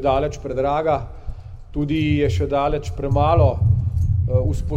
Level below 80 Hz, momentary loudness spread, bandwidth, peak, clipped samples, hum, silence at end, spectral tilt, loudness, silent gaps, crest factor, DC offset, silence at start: -30 dBFS; 14 LU; 8.2 kHz; -4 dBFS; under 0.1%; none; 0 s; -8 dB/octave; -20 LUFS; none; 16 dB; under 0.1%; 0 s